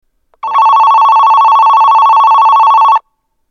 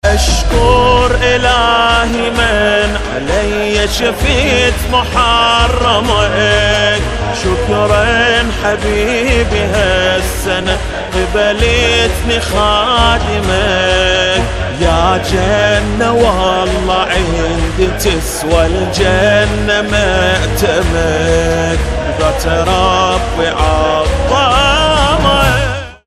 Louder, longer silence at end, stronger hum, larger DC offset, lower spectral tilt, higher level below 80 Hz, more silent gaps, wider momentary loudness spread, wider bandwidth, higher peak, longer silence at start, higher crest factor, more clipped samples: first, -6 LUFS vs -11 LUFS; first, 0.5 s vs 0.1 s; neither; neither; second, 1.5 dB/octave vs -4 dB/octave; second, -64 dBFS vs -20 dBFS; neither; about the same, 5 LU vs 5 LU; second, 6.6 kHz vs 15 kHz; about the same, 0 dBFS vs 0 dBFS; first, 0.45 s vs 0.05 s; second, 6 dB vs 12 dB; second, under 0.1% vs 0.1%